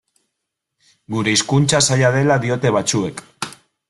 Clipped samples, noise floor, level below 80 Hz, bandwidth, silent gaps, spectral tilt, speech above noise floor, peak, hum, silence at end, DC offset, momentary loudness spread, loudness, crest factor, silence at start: under 0.1%; -78 dBFS; -54 dBFS; 12 kHz; none; -4 dB/octave; 62 dB; -2 dBFS; none; 0.35 s; under 0.1%; 15 LU; -16 LUFS; 18 dB; 1.1 s